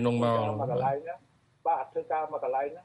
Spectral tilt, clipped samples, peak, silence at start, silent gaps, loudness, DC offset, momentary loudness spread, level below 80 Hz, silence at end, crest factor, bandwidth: -8 dB/octave; under 0.1%; -14 dBFS; 0 s; none; -30 LUFS; under 0.1%; 9 LU; -68 dBFS; 0 s; 16 dB; 11 kHz